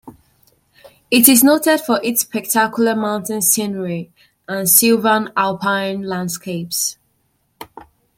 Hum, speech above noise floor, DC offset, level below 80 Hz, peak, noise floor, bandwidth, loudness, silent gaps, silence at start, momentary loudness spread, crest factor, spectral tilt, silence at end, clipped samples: none; 48 dB; under 0.1%; -62 dBFS; 0 dBFS; -64 dBFS; 17 kHz; -15 LUFS; none; 0.05 s; 13 LU; 18 dB; -3 dB/octave; 0.35 s; under 0.1%